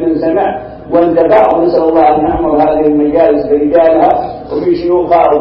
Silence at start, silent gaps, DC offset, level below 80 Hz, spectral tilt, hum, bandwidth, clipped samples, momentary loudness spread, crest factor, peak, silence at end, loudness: 0 s; none; under 0.1%; -36 dBFS; -9.5 dB/octave; none; 5.8 kHz; 0.1%; 7 LU; 10 dB; 0 dBFS; 0 s; -10 LUFS